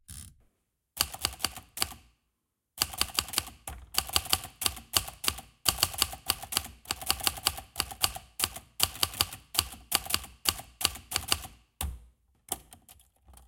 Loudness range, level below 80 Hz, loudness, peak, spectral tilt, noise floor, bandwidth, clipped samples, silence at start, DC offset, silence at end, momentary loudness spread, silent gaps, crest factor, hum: 3 LU; -50 dBFS; -30 LUFS; -4 dBFS; -0.5 dB/octave; -82 dBFS; 17 kHz; under 0.1%; 0.1 s; under 0.1%; 0.05 s; 11 LU; none; 30 dB; none